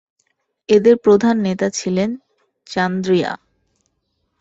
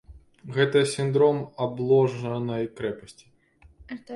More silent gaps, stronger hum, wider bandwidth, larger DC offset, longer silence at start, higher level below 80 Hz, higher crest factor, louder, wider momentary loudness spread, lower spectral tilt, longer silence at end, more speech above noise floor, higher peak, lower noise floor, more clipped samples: neither; neither; second, 8 kHz vs 11.5 kHz; neither; first, 0.7 s vs 0.1 s; about the same, -58 dBFS vs -58 dBFS; about the same, 16 dB vs 18 dB; first, -17 LUFS vs -24 LUFS; first, 15 LU vs 12 LU; about the same, -5.5 dB/octave vs -6 dB/octave; first, 1.05 s vs 0 s; first, 54 dB vs 33 dB; first, -2 dBFS vs -8 dBFS; first, -70 dBFS vs -57 dBFS; neither